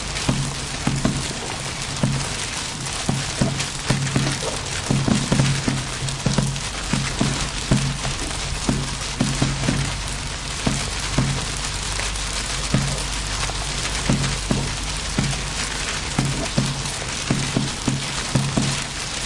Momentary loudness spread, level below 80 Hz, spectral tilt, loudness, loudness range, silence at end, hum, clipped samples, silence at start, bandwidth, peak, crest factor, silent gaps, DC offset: 4 LU; -32 dBFS; -3.5 dB/octave; -23 LUFS; 2 LU; 0 s; none; under 0.1%; 0 s; 11.5 kHz; -6 dBFS; 18 dB; none; under 0.1%